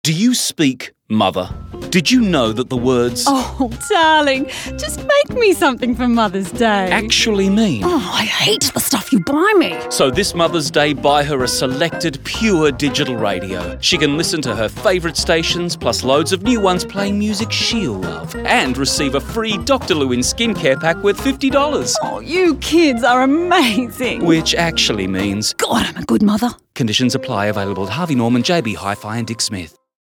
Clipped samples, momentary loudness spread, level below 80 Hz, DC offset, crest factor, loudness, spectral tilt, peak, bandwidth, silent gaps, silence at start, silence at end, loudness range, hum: under 0.1%; 7 LU; -38 dBFS; under 0.1%; 14 dB; -16 LUFS; -4 dB/octave; -2 dBFS; 19.5 kHz; none; 0.05 s; 0.35 s; 2 LU; none